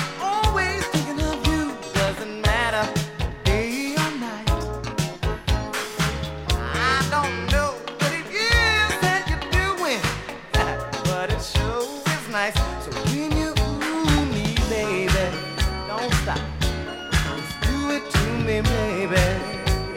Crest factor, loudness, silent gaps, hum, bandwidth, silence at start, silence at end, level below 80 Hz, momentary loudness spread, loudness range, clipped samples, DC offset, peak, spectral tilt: 18 dB; -23 LUFS; none; none; 16.5 kHz; 0 s; 0 s; -30 dBFS; 6 LU; 3 LU; under 0.1%; under 0.1%; -4 dBFS; -4.5 dB/octave